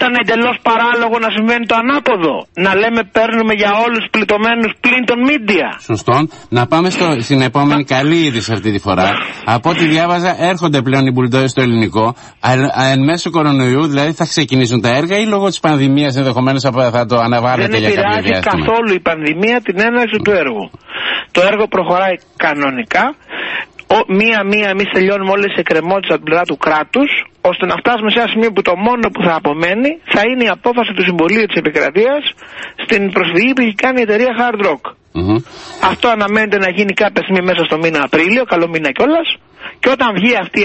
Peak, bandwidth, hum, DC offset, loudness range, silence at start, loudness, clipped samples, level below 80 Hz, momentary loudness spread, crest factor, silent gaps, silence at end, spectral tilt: 0 dBFS; 8.6 kHz; none; under 0.1%; 1 LU; 0 s; -13 LUFS; under 0.1%; -44 dBFS; 5 LU; 12 dB; none; 0 s; -5.5 dB/octave